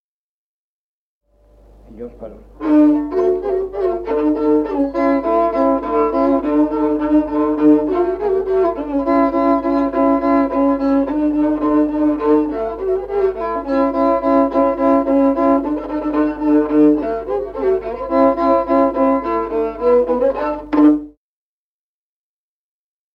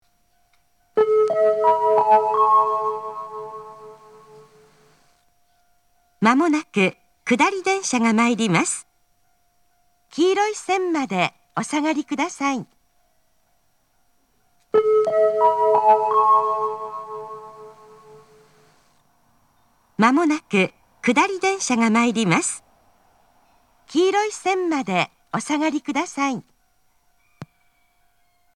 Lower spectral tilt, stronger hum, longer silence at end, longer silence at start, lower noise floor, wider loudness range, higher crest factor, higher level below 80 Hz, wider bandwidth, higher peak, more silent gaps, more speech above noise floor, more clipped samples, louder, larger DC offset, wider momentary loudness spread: first, -8.5 dB/octave vs -4.5 dB/octave; neither; first, 2.05 s vs 1.1 s; first, 1.9 s vs 0.95 s; first, under -90 dBFS vs -66 dBFS; second, 3 LU vs 8 LU; second, 16 dB vs 22 dB; first, -42 dBFS vs -72 dBFS; second, 5.4 kHz vs 12.5 kHz; about the same, -2 dBFS vs 0 dBFS; neither; first, over 74 dB vs 46 dB; neither; first, -16 LUFS vs -20 LUFS; neither; second, 7 LU vs 15 LU